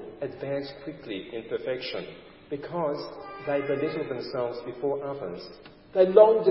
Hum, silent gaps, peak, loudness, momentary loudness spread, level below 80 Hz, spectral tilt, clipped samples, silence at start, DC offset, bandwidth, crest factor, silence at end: none; none; -4 dBFS; -28 LUFS; 18 LU; -66 dBFS; -10 dB/octave; under 0.1%; 0 s; under 0.1%; 5.8 kHz; 22 dB; 0 s